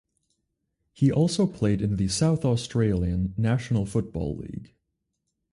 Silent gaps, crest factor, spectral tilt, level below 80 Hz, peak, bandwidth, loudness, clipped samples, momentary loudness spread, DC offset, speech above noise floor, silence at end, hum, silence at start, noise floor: none; 16 dB; -6.5 dB/octave; -44 dBFS; -10 dBFS; 11.5 kHz; -25 LUFS; under 0.1%; 9 LU; under 0.1%; 55 dB; 0.85 s; none; 1 s; -79 dBFS